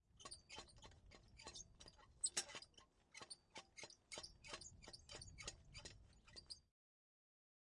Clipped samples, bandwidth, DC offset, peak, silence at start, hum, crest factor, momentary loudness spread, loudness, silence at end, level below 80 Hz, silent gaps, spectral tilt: under 0.1%; 12 kHz; under 0.1%; -28 dBFS; 0.1 s; none; 30 dB; 18 LU; -54 LUFS; 1.05 s; -72 dBFS; none; -0.5 dB/octave